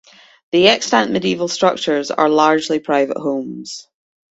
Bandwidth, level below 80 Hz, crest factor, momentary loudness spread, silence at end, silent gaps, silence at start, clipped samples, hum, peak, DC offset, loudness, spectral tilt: 8.2 kHz; -60 dBFS; 18 dB; 14 LU; 0.5 s; none; 0.55 s; under 0.1%; none; 0 dBFS; under 0.1%; -16 LUFS; -3.5 dB/octave